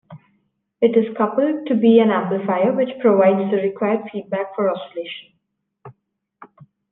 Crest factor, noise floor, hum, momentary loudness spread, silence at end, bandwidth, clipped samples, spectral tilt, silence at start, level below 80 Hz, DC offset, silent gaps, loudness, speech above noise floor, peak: 16 dB; -73 dBFS; none; 13 LU; 0.45 s; 4 kHz; under 0.1%; -10 dB/octave; 0.1 s; -72 dBFS; under 0.1%; none; -18 LUFS; 55 dB; -2 dBFS